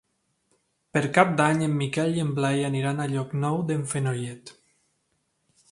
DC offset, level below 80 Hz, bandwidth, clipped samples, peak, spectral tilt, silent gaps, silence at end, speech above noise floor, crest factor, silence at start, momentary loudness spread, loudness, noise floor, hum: under 0.1%; -66 dBFS; 11.5 kHz; under 0.1%; -2 dBFS; -6 dB/octave; none; 1.2 s; 49 dB; 24 dB; 0.95 s; 8 LU; -25 LUFS; -73 dBFS; none